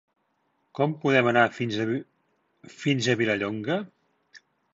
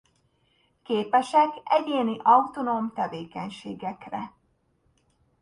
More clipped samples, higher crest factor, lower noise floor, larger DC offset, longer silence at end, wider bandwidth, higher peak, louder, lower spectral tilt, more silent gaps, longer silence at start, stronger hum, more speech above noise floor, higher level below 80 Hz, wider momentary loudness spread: neither; about the same, 20 dB vs 22 dB; about the same, -72 dBFS vs -69 dBFS; neither; second, 0.35 s vs 1.1 s; second, 8 kHz vs 11 kHz; about the same, -6 dBFS vs -6 dBFS; about the same, -25 LUFS vs -25 LUFS; about the same, -5.5 dB/octave vs -5.5 dB/octave; neither; second, 0.75 s vs 0.9 s; neither; first, 48 dB vs 44 dB; about the same, -68 dBFS vs -70 dBFS; second, 10 LU vs 16 LU